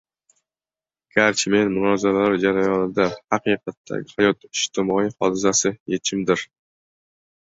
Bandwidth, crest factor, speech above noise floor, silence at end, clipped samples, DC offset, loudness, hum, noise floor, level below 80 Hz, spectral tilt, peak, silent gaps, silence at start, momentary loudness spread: 8 kHz; 20 dB; over 69 dB; 1.05 s; under 0.1%; under 0.1%; -21 LUFS; none; under -90 dBFS; -58 dBFS; -3.5 dB/octave; -2 dBFS; 3.77-3.84 s, 5.80-5.86 s; 1.15 s; 6 LU